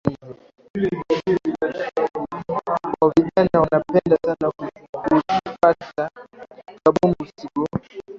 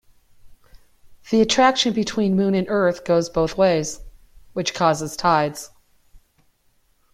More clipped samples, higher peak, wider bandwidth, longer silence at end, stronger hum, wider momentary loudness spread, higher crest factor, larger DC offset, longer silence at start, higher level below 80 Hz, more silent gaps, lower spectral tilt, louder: neither; about the same, -2 dBFS vs -4 dBFS; second, 7.6 kHz vs 15 kHz; second, 0 s vs 0.95 s; neither; about the same, 12 LU vs 13 LU; about the same, 18 dB vs 18 dB; neither; second, 0.05 s vs 0.45 s; about the same, -50 dBFS vs -48 dBFS; first, 0.70-0.74 s, 4.89-4.93 s vs none; first, -8 dB/octave vs -4.5 dB/octave; about the same, -21 LUFS vs -20 LUFS